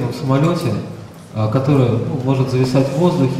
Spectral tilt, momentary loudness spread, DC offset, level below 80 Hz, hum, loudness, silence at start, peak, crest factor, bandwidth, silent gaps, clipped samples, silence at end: -8 dB/octave; 11 LU; under 0.1%; -46 dBFS; none; -17 LUFS; 0 s; -2 dBFS; 14 dB; 14 kHz; none; under 0.1%; 0 s